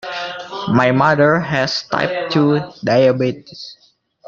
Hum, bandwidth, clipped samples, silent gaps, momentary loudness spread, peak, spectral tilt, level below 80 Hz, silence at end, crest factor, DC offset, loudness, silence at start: none; 7.4 kHz; under 0.1%; none; 15 LU; 0 dBFS; -6.5 dB/octave; -54 dBFS; 0.55 s; 16 dB; under 0.1%; -16 LUFS; 0.05 s